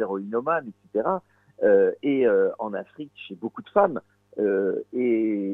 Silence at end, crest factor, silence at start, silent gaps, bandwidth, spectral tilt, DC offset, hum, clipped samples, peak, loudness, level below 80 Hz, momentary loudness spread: 0 s; 18 dB; 0 s; none; 3.9 kHz; -9 dB/octave; under 0.1%; none; under 0.1%; -6 dBFS; -24 LUFS; -70 dBFS; 15 LU